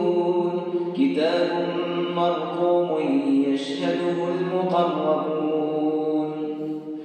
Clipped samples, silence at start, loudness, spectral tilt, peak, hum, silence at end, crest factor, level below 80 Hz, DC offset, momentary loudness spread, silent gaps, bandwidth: under 0.1%; 0 s; -23 LUFS; -7 dB/octave; -10 dBFS; none; 0 s; 14 dB; -84 dBFS; under 0.1%; 5 LU; none; 9 kHz